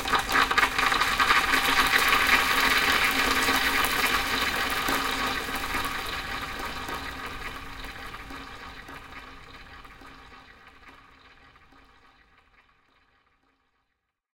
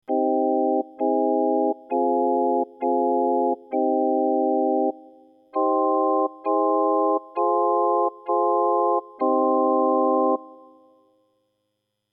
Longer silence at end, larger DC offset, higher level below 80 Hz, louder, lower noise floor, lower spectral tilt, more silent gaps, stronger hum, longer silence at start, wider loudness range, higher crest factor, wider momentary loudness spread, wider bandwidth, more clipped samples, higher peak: first, 3.4 s vs 1.55 s; neither; first, -44 dBFS vs under -90 dBFS; about the same, -23 LUFS vs -22 LUFS; about the same, -79 dBFS vs -77 dBFS; second, -1.5 dB/octave vs -10.5 dB/octave; neither; neither; about the same, 0 s vs 0.1 s; first, 22 LU vs 2 LU; first, 24 dB vs 12 dB; first, 21 LU vs 4 LU; first, 17 kHz vs 2.7 kHz; neither; first, -4 dBFS vs -10 dBFS